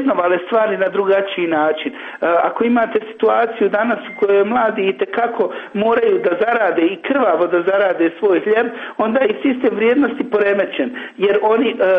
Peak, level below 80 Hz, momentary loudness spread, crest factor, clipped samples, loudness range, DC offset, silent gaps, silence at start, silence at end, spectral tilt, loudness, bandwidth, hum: -4 dBFS; -62 dBFS; 5 LU; 12 dB; under 0.1%; 1 LU; under 0.1%; none; 0 s; 0 s; -7.5 dB/octave; -16 LUFS; 4.7 kHz; none